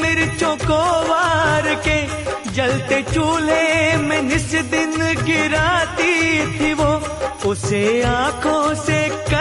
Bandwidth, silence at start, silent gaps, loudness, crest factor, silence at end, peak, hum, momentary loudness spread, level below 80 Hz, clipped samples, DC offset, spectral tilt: 11.5 kHz; 0 s; none; -17 LUFS; 14 dB; 0 s; -4 dBFS; none; 4 LU; -36 dBFS; under 0.1%; under 0.1%; -4.5 dB/octave